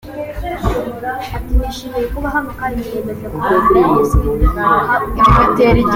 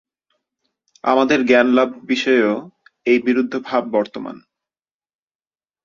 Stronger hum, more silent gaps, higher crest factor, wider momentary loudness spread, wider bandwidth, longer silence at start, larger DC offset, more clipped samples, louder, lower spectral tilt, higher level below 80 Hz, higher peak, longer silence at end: neither; neither; second, 14 dB vs 20 dB; about the same, 12 LU vs 13 LU; first, 17 kHz vs 7.2 kHz; second, 0.05 s vs 1.05 s; neither; neither; about the same, -15 LUFS vs -17 LUFS; first, -7 dB/octave vs -5 dB/octave; first, -22 dBFS vs -62 dBFS; about the same, 0 dBFS vs 0 dBFS; second, 0 s vs 1.45 s